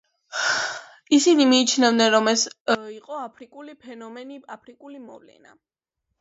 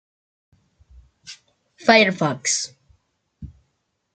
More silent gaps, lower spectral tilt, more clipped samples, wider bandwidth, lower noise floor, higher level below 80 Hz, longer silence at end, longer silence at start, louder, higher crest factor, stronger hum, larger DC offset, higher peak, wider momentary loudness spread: first, 2.60-2.65 s vs none; about the same, -2 dB/octave vs -3 dB/octave; neither; second, 8 kHz vs 9.4 kHz; first, -80 dBFS vs -73 dBFS; second, -76 dBFS vs -56 dBFS; first, 1.05 s vs 0.65 s; second, 0.35 s vs 1.25 s; about the same, -19 LUFS vs -18 LUFS; about the same, 20 dB vs 24 dB; neither; neither; about the same, -4 dBFS vs -2 dBFS; about the same, 25 LU vs 26 LU